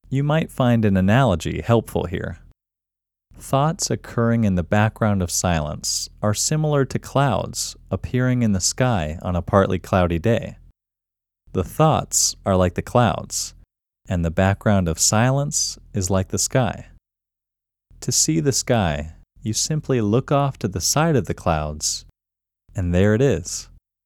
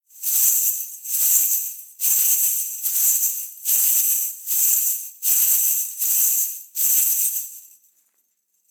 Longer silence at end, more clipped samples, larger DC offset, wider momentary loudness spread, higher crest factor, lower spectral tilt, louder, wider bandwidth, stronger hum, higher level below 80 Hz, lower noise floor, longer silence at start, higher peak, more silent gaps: second, 0.4 s vs 1.1 s; neither; neither; about the same, 9 LU vs 7 LU; about the same, 20 dB vs 18 dB; first, -4.5 dB/octave vs 6.5 dB/octave; second, -20 LUFS vs -17 LUFS; second, 18 kHz vs over 20 kHz; neither; first, -40 dBFS vs under -90 dBFS; first, -87 dBFS vs -68 dBFS; about the same, 0.1 s vs 0.15 s; about the same, 0 dBFS vs -2 dBFS; neither